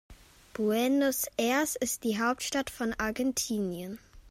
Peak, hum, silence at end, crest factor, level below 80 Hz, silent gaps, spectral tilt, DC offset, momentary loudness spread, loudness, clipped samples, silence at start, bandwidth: -14 dBFS; none; 0 s; 16 dB; -58 dBFS; none; -3 dB/octave; under 0.1%; 10 LU; -30 LUFS; under 0.1%; 0.1 s; 16 kHz